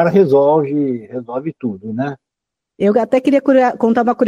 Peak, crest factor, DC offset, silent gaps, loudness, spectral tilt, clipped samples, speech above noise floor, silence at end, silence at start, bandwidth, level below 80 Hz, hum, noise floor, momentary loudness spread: -2 dBFS; 14 dB; under 0.1%; none; -15 LUFS; -8.5 dB/octave; under 0.1%; 68 dB; 0 s; 0 s; 10 kHz; -60 dBFS; none; -82 dBFS; 13 LU